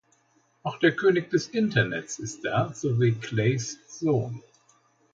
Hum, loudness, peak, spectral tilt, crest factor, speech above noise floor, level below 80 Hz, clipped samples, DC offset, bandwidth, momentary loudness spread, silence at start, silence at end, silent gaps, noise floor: none; -26 LUFS; -8 dBFS; -5.5 dB/octave; 18 dB; 41 dB; -62 dBFS; under 0.1%; under 0.1%; 7.8 kHz; 13 LU; 0.65 s; 0.75 s; none; -66 dBFS